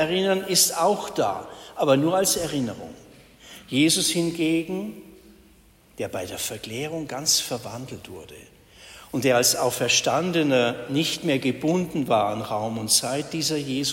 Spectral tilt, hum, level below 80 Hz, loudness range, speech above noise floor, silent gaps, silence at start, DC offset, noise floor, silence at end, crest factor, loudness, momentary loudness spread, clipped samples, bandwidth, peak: -3 dB/octave; none; -58 dBFS; 6 LU; 31 dB; none; 0 s; under 0.1%; -55 dBFS; 0 s; 20 dB; -23 LUFS; 15 LU; under 0.1%; 16.5 kHz; -6 dBFS